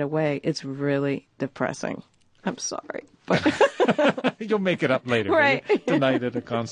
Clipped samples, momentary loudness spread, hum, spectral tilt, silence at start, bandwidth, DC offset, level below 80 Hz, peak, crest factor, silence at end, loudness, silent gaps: under 0.1%; 13 LU; none; -5 dB/octave; 0 s; 10.5 kHz; under 0.1%; -60 dBFS; -6 dBFS; 18 dB; 0 s; -24 LUFS; none